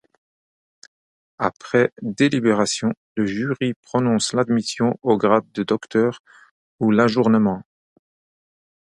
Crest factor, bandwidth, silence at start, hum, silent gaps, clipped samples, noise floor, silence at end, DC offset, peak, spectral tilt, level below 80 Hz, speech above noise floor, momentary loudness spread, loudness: 20 dB; 11.5 kHz; 1.4 s; none; 2.97-3.15 s, 3.76-3.83 s, 6.20-6.24 s, 6.51-6.79 s; under 0.1%; under -90 dBFS; 1.3 s; under 0.1%; -2 dBFS; -5.5 dB/octave; -60 dBFS; over 70 dB; 8 LU; -20 LUFS